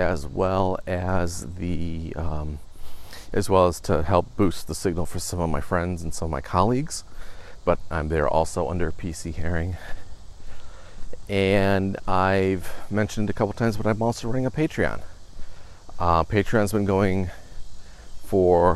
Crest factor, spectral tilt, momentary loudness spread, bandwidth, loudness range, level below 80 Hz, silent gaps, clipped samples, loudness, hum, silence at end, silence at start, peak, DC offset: 20 dB; -6 dB/octave; 12 LU; 13.5 kHz; 4 LU; -38 dBFS; none; under 0.1%; -25 LUFS; none; 0 s; 0 s; -4 dBFS; under 0.1%